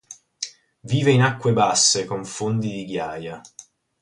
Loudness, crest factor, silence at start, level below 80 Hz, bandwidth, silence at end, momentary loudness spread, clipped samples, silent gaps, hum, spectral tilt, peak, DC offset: -20 LUFS; 18 dB; 0.1 s; -58 dBFS; 11.5 kHz; 0.4 s; 16 LU; under 0.1%; none; none; -4 dB/octave; -4 dBFS; under 0.1%